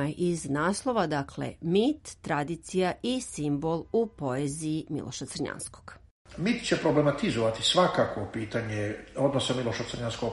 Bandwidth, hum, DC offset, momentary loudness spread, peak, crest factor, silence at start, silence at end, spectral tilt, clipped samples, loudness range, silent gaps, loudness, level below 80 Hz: 11.5 kHz; none; under 0.1%; 10 LU; -10 dBFS; 20 dB; 0 s; 0 s; -5 dB/octave; under 0.1%; 5 LU; 6.11-6.25 s; -29 LUFS; -56 dBFS